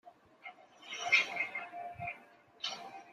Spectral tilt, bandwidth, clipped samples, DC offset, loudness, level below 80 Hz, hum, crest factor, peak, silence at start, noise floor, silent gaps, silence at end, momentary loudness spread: -1 dB/octave; 14 kHz; under 0.1%; under 0.1%; -35 LUFS; -78 dBFS; none; 26 dB; -12 dBFS; 0.05 s; -59 dBFS; none; 0 s; 24 LU